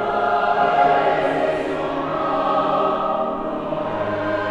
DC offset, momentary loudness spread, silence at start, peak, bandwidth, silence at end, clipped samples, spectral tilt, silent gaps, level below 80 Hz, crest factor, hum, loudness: under 0.1%; 8 LU; 0 s; -6 dBFS; 10 kHz; 0 s; under 0.1%; -6.5 dB/octave; none; -48 dBFS; 14 dB; none; -20 LUFS